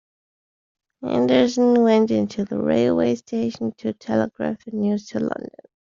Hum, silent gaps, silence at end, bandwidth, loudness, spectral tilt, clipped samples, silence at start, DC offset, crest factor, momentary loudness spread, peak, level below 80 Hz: none; none; 0.4 s; 7.4 kHz; -21 LUFS; -5.5 dB/octave; under 0.1%; 1 s; under 0.1%; 16 dB; 11 LU; -4 dBFS; -60 dBFS